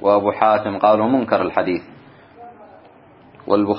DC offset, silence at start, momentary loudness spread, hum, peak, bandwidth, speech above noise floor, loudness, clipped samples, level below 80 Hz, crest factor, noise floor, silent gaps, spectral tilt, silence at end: under 0.1%; 0 s; 8 LU; none; 0 dBFS; 5.6 kHz; 30 dB; -18 LUFS; under 0.1%; -60 dBFS; 18 dB; -47 dBFS; none; -11 dB/octave; 0 s